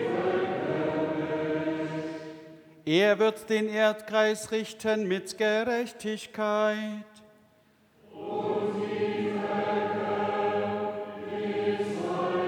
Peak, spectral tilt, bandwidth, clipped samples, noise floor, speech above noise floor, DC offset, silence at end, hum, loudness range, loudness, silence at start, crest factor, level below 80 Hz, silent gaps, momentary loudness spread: -10 dBFS; -5 dB/octave; 18 kHz; under 0.1%; -63 dBFS; 36 dB; under 0.1%; 0 s; none; 5 LU; -29 LUFS; 0 s; 18 dB; -74 dBFS; none; 10 LU